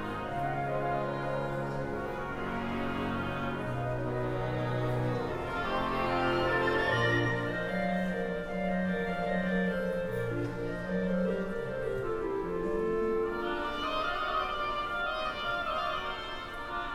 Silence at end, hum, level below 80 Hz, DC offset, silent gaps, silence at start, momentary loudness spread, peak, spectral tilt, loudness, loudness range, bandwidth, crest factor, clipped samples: 0 s; none; -48 dBFS; under 0.1%; none; 0 s; 7 LU; -18 dBFS; -7 dB/octave; -32 LUFS; 4 LU; 15.5 kHz; 14 dB; under 0.1%